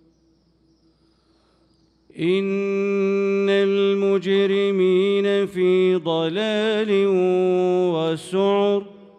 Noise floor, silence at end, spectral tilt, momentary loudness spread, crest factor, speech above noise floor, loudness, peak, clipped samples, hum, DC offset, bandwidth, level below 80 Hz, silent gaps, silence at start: -61 dBFS; 0.25 s; -6.5 dB/octave; 4 LU; 12 dB; 41 dB; -20 LUFS; -8 dBFS; under 0.1%; none; under 0.1%; 10 kHz; -70 dBFS; none; 2.15 s